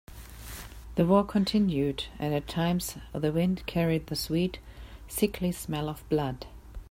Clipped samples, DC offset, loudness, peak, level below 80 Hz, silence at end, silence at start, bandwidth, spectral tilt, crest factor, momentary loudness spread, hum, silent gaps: under 0.1%; under 0.1%; -29 LUFS; -12 dBFS; -46 dBFS; 0.1 s; 0.1 s; 16 kHz; -6 dB/octave; 18 dB; 19 LU; none; none